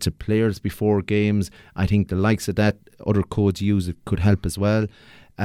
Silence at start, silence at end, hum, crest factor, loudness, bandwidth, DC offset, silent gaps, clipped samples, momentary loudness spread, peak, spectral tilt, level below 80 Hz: 0 s; 0 s; none; 16 dB; -22 LUFS; 15 kHz; under 0.1%; none; under 0.1%; 5 LU; -6 dBFS; -7 dB/octave; -40 dBFS